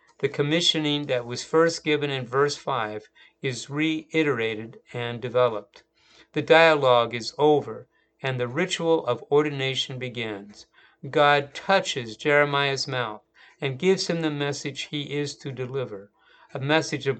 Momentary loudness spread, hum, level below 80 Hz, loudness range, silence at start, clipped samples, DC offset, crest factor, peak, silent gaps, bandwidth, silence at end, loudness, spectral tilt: 13 LU; none; -68 dBFS; 5 LU; 0.2 s; under 0.1%; under 0.1%; 24 dB; -2 dBFS; none; 9.2 kHz; 0 s; -24 LUFS; -4.5 dB/octave